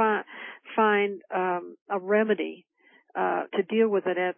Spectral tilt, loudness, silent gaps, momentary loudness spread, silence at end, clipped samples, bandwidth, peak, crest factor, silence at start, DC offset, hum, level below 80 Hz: -9.5 dB/octave; -26 LUFS; 1.81-1.86 s; 11 LU; 0.05 s; under 0.1%; 3.5 kHz; -12 dBFS; 16 dB; 0 s; under 0.1%; none; -84 dBFS